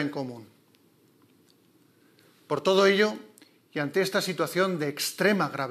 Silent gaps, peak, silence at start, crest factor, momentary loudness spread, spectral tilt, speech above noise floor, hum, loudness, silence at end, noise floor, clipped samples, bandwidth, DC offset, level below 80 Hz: none; -8 dBFS; 0 s; 20 dB; 16 LU; -4.5 dB/octave; 36 dB; none; -26 LUFS; 0 s; -62 dBFS; under 0.1%; 15 kHz; under 0.1%; under -90 dBFS